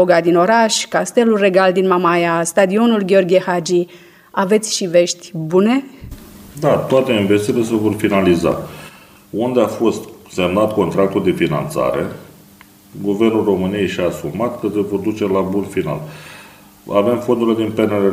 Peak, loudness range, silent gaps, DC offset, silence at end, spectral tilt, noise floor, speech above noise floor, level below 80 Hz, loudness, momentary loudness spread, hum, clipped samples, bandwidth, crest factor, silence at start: 0 dBFS; 5 LU; none; under 0.1%; 0 s; -5 dB/octave; -45 dBFS; 29 dB; -48 dBFS; -16 LUFS; 12 LU; none; under 0.1%; 16 kHz; 16 dB; 0 s